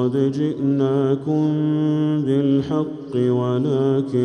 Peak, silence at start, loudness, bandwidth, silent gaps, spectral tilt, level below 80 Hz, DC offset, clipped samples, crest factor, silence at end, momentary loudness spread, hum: -8 dBFS; 0 s; -20 LUFS; 8.8 kHz; none; -9.5 dB/octave; -60 dBFS; under 0.1%; under 0.1%; 12 dB; 0 s; 3 LU; none